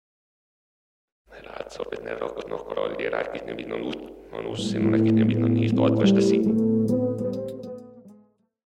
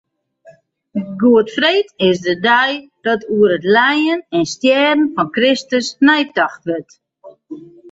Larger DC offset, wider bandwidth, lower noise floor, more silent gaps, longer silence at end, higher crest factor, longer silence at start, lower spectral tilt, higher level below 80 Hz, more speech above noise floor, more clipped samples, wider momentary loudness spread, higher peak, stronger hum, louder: neither; first, 10 kHz vs 8 kHz; first, -59 dBFS vs -47 dBFS; neither; first, 0.6 s vs 0 s; first, 20 dB vs 14 dB; first, 1.3 s vs 0.95 s; first, -7.5 dB/octave vs -4.5 dB/octave; about the same, -58 dBFS vs -60 dBFS; about the same, 35 dB vs 33 dB; neither; first, 18 LU vs 13 LU; second, -6 dBFS vs -2 dBFS; neither; second, -24 LUFS vs -15 LUFS